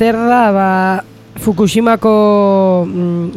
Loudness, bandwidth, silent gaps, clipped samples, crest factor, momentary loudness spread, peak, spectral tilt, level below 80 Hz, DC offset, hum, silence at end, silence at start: -12 LUFS; 15 kHz; none; under 0.1%; 12 dB; 7 LU; 0 dBFS; -6.5 dB/octave; -46 dBFS; under 0.1%; none; 0 s; 0 s